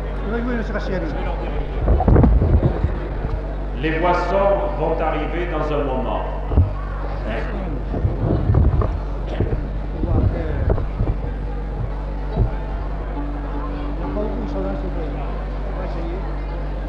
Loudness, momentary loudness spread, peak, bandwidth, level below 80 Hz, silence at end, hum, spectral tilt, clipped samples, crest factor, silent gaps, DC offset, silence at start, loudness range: -22 LUFS; 10 LU; -2 dBFS; 5.8 kHz; -22 dBFS; 0 s; none; -9.5 dB/octave; under 0.1%; 18 dB; none; under 0.1%; 0 s; 7 LU